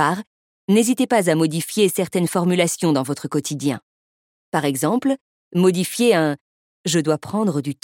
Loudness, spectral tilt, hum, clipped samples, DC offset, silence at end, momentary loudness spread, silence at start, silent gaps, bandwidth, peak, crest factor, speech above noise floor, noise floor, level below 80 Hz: -20 LUFS; -5 dB/octave; none; under 0.1%; under 0.1%; 0.1 s; 9 LU; 0 s; 0.27-0.68 s, 3.82-4.52 s, 5.21-5.51 s, 6.41-6.84 s; 17.5 kHz; -2 dBFS; 18 dB; over 71 dB; under -90 dBFS; -68 dBFS